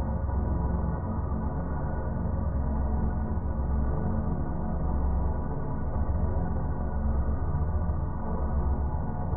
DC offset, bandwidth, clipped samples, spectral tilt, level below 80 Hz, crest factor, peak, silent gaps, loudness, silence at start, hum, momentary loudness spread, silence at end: under 0.1%; 2.1 kHz; under 0.1%; -8.5 dB/octave; -30 dBFS; 12 dB; -16 dBFS; none; -31 LUFS; 0 s; none; 3 LU; 0 s